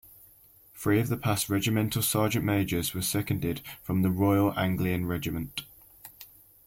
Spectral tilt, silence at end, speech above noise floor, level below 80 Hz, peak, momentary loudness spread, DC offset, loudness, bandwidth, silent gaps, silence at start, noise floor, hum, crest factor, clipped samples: -5 dB/octave; 0.4 s; 30 dB; -54 dBFS; -12 dBFS; 17 LU; under 0.1%; -28 LUFS; 16.5 kHz; none; 0.75 s; -57 dBFS; none; 16 dB; under 0.1%